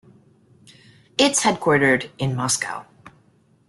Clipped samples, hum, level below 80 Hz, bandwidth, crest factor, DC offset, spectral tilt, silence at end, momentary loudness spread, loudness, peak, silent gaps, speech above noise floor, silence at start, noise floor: under 0.1%; none; -58 dBFS; 12.5 kHz; 18 dB; under 0.1%; -3.5 dB/octave; 0.6 s; 12 LU; -20 LUFS; -6 dBFS; none; 39 dB; 1.2 s; -58 dBFS